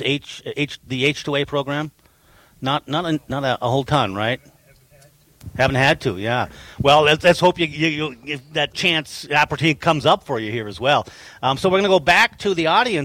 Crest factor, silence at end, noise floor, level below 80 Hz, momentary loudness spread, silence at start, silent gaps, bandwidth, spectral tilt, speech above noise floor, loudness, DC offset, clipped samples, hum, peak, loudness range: 16 dB; 0 s; -53 dBFS; -50 dBFS; 11 LU; 0 s; none; 17 kHz; -5 dB/octave; 34 dB; -19 LUFS; under 0.1%; under 0.1%; none; -4 dBFS; 5 LU